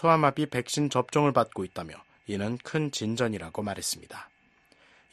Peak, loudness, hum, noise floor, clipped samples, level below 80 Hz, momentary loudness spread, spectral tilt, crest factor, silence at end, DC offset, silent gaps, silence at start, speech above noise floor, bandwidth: -6 dBFS; -28 LUFS; none; -63 dBFS; under 0.1%; -62 dBFS; 16 LU; -5 dB/octave; 22 dB; 0.85 s; under 0.1%; none; 0 s; 35 dB; 13 kHz